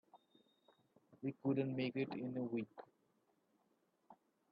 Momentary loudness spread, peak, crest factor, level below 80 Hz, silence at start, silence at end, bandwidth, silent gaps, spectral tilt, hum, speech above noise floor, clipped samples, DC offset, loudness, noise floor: 10 LU; -26 dBFS; 20 dB; -88 dBFS; 0.15 s; 0.35 s; 5.2 kHz; none; -6.5 dB/octave; none; 39 dB; under 0.1%; under 0.1%; -43 LUFS; -80 dBFS